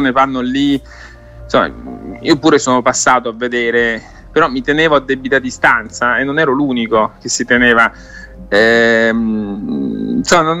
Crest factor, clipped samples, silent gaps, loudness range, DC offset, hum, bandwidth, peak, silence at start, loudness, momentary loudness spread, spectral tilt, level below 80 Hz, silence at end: 14 dB; under 0.1%; none; 2 LU; under 0.1%; none; 13.5 kHz; 0 dBFS; 0 s; -13 LUFS; 10 LU; -3.5 dB/octave; -40 dBFS; 0 s